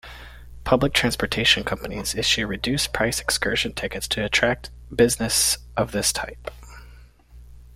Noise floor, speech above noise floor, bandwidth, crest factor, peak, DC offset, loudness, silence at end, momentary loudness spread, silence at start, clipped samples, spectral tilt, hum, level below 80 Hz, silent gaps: -47 dBFS; 24 dB; 16.5 kHz; 22 dB; -2 dBFS; under 0.1%; -22 LUFS; 0 s; 13 LU; 0.05 s; under 0.1%; -2.5 dB/octave; none; -40 dBFS; none